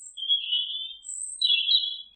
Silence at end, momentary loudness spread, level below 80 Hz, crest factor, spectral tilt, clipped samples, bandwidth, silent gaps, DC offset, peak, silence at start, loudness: 0.1 s; 13 LU; -76 dBFS; 18 dB; 7 dB/octave; under 0.1%; 9.2 kHz; none; under 0.1%; -10 dBFS; 0 s; -24 LUFS